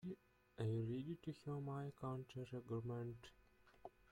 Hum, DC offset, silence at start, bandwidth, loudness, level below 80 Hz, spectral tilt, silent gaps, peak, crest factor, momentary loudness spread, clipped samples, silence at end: none; under 0.1%; 0 s; 10.5 kHz; -48 LUFS; -74 dBFS; -8.5 dB/octave; none; -32 dBFS; 16 dB; 18 LU; under 0.1%; 0.2 s